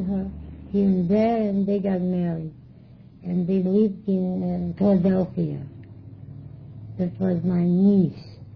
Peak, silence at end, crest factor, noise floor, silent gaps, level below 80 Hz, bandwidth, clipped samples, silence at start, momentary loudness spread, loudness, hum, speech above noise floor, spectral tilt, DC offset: -8 dBFS; 0 s; 14 dB; -47 dBFS; none; -50 dBFS; 5.4 kHz; under 0.1%; 0 s; 22 LU; -23 LUFS; none; 25 dB; -11.5 dB/octave; under 0.1%